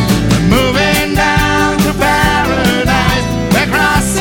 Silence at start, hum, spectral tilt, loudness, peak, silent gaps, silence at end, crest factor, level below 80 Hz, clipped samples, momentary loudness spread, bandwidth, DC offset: 0 s; none; -4.5 dB/octave; -11 LUFS; 0 dBFS; none; 0 s; 12 dB; -24 dBFS; under 0.1%; 2 LU; 18 kHz; under 0.1%